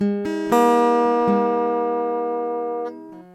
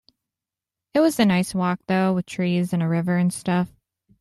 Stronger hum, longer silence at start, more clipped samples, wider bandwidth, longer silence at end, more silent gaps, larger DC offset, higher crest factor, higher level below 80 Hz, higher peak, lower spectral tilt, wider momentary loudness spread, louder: neither; second, 0 s vs 0.95 s; neither; first, 15 kHz vs 13 kHz; second, 0.1 s vs 0.55 s; neither; neither; about the same, 16 dB vs 18 dB; about the same, -62 dBFS vs -60 dBFS; about the same, -4 dBFS vs -4 dBFS; about the same, -6.5 dB/octave vs -6.5 dB/octave; first, 11 LU vs 6 LU; about the same, -20 LUFS vs -22 LUFS